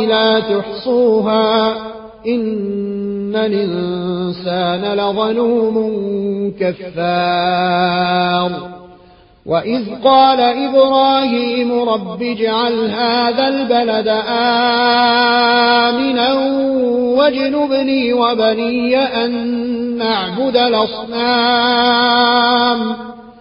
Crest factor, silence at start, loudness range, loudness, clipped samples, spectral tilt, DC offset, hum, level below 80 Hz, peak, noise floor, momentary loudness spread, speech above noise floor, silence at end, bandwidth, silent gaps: 14 dB; 0 s; 5 LU; -14 LUFS; under 0.1%; -9.5 dB/octave; under 0.1%; none; -52 dBFS; 0 dBFS; -45 dBFS; 9 LU; 31 dB; 0.1 s; 5.4 kHz; none